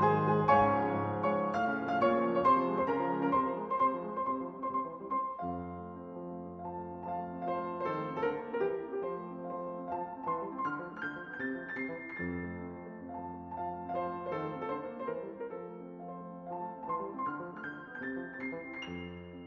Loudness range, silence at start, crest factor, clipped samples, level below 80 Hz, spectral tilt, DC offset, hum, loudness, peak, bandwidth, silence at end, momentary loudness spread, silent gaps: 10 LU; 0 s; 22 dB; under 0.1%; -62 dBFS; -5.5 dB/octave; under 0.1%; none; -35 LUFS; -12 dBFS; 6.4 kHz; 0 s; 15 LU; none